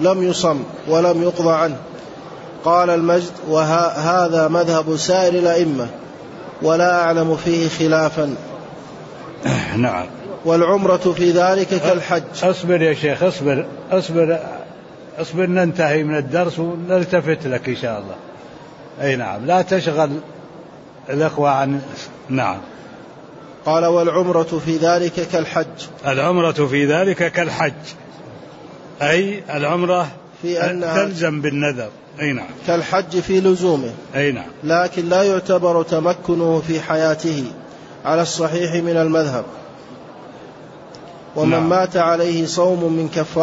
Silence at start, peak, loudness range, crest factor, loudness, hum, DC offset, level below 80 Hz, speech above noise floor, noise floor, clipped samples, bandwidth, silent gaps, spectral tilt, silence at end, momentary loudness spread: 0 s; -4 dBFS; 4 LU; 14 dB; -18 LUFS; none; under 0.1%; -56 dBFS; 22 dB; -39 dBFS; under 0.1%; 8 kHz; none; -5.5 dB/octave; 0 s; 20 LU